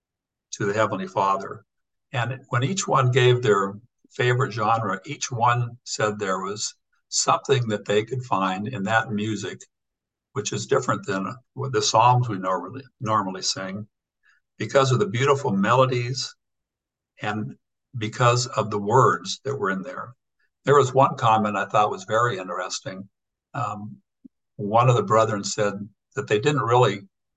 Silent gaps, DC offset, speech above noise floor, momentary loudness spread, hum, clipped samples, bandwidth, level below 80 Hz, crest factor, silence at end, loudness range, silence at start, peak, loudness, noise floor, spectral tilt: none; under 0.1%; 64 dB; 15 LU; none; under 0.1%; 9.2 kHz; -64 dBFS; 20 dB; 0.3 s; 4 LU; 0.5 s; -4 dBFS; -23 LUFS; -87 dBFS; -5 dB/octave